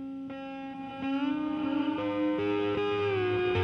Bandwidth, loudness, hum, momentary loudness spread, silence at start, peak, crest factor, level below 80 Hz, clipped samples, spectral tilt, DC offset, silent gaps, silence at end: 6.4 kHz; -31 LUFS; 60 Hz at -55 dBFS; 11 LU; 0 s; -18 dBFS; 14 dB; -60 dBFS; under 0.1%; -8 dB/octave; under 0.1%; none; 0 s